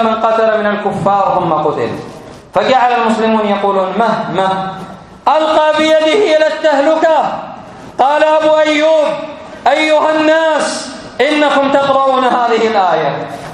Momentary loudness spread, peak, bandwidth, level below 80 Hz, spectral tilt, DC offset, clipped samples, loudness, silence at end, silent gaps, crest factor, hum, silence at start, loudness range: 12 LU; 0 dBFS; 11 kHz; -52 dBFS; -4.5 dB/octave; under 0.1%; under 0.1%; -12 LUFS; 0 s; none; 12 dB; none; 0 s; 2 LU